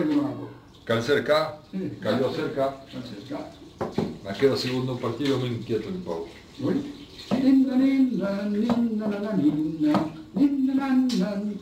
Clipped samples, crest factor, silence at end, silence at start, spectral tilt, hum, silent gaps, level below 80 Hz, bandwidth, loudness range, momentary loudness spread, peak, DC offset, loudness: under 0.1%; 16 dB; 0 s; 0 s; -6.5 dB/octave; none; none; -58 dBFS; 15 kHz; 5 LU; 15 LU; -8 dBFS; under 0.1%; -25 LUFS